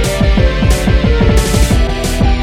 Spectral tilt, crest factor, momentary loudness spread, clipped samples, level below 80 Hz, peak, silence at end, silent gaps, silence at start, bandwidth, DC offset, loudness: -5.5 dB/octave; 10 dB; 3 LU; under 0.1%; -12 dBFS; 0 dBFS; 0 s; none; 0 s; 15.5 kHz; under 0.1%; -12 LUFS